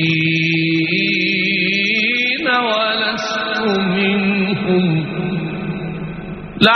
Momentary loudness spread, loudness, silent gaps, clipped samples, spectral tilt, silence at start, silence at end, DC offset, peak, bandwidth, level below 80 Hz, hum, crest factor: 10 LU; -16 LUFS; none; under 0.1%; -3 dB/octave; 0 s; 0 s; under 0.1%; 0 dBFS; 6.4 kHz; -48 dBFS; none; 16 dB